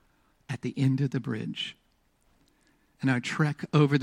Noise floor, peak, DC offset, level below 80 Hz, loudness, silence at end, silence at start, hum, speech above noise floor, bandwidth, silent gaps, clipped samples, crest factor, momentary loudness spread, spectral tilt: -68 dBFS; -10 dBFS; under 0.1%; -68 dBFS; -29 LUFS; 0 s; 0.5 s; none; 41 dB; 10.5 kHz; none; under 0.1%; 20 dB; 11 LU; -7 dB/octave